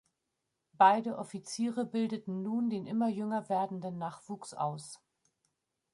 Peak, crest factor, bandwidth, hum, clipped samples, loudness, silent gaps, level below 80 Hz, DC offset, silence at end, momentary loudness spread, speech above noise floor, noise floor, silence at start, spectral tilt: -12 dBFS; 22 dB; 11.5 kHz; none; under 0.1%; -33 LUFS; none; -82 dBFS; under 0.1%; 1 s; 17 LU; 52 dB; -85 dBFS; 0.8 s; -5.5 dB/octave